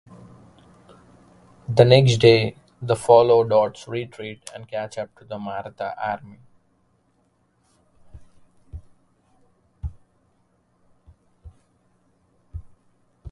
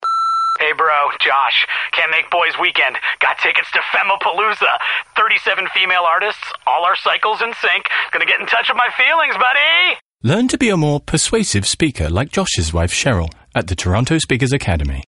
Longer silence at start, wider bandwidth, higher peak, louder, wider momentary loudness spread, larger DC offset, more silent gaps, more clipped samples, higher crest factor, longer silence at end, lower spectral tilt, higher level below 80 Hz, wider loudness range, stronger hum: first, 1.7 s vs 0 s; about the same, 11.5 kHz vs 11.5 kHz; about the same, 0 dBFS vs -2 dBFS; second, -20 LUFS vs -15 LUFS; first, 27 LU vs 5 LU; neither; second, none vs 10.02-10.15 s; neither; first, 24 dB vs 14 dB; about the same, 0.05 s vs 0 s; first, -6 dB/octave vs -3.5 dB/octave; second, -48 dBFS vs -34 dBFS; first, 17 LU vs 3 LU; neither